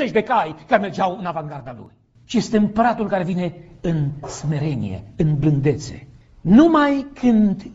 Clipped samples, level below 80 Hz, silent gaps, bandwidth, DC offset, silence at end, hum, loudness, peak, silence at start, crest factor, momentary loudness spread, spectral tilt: under 0.1%; -44 dBFS; none; 8 kHz; under 0.1%; 0 s; none; -19 LUFS; 0 dBFS; 0 s; 18 dB; 14 LU; -7 dB/octave